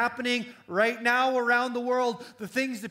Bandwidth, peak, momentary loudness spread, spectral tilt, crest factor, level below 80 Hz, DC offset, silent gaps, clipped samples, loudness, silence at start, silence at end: 16 kHz; -10 dBFS; 8 LU; -3.5 dB/octave; 16 dB; -78 dBFS; under 0.1%; none; under 0.1%; -26 LUFS; 0 s; 0 s